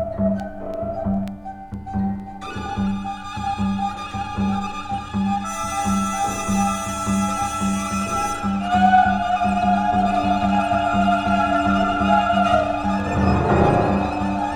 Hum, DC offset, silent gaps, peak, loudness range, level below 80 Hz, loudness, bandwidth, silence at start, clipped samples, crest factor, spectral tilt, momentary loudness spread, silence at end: none; under 0.1%; none; -4 dBFS; 8 LU; -36 dBFS; -21 LUFS; 19 kHz; 0 s; under 0.1%; 16 dB; -5.5 dB/octave; 11 LU; 0 s